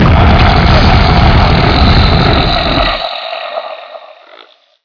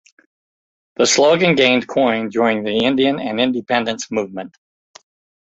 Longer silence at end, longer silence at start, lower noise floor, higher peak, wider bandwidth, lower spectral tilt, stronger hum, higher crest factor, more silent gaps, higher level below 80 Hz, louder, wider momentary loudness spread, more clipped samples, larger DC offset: about the same, 0.85 s vs 0.95 s; second, 0 s vs 1 s; second, -41 dBFS vs under -90 dBFS; about the same, 0 dBFS vs -2 dBFS; second, 5.4 kHz vs 8.4 kHz; first, -7 dB/octave vs -3.5 dB/octave; neither; second, 8 dB vs 16 dB; neither; first, -14 dBFS vs -60 dBFS; first, -9 LUFS vs -16 LUFS; about the same, 13 LU vs 12 LU; first, 0.2% vs under 0.1%; neither